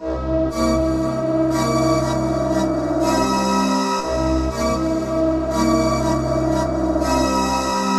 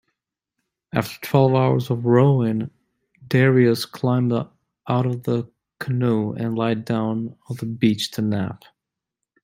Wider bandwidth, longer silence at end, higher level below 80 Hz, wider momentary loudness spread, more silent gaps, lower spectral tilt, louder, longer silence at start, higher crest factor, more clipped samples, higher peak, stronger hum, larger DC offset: second, 14 kHz vs 16 kHz; second, 0 s vs 0.85 s; first, -32 dBFS vs -60 dBFS; second, 3 LU vs 14 LU; neither; second, -5.5 dB/octave vs -7.5 dB/octave; about the same, -19 LUFS vs -21 LUFS; second, 0 s vs 0.95 s; about the same, 14 dB vs 18 dB; neither; second, -6 dBFS vs -2 dBFS; neither; neither